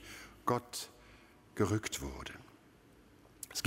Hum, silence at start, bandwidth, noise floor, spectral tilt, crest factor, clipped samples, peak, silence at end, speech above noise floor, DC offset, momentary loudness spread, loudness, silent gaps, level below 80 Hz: none; 0 s; 16 kHz; -62 dBFS; -4.5 dB/octave; 24 dB; under 0.1%; -16 dBFS; 0 s; 26 dB; under 0.1%; 25 LU; -38 LUFS; none; -58 dBFS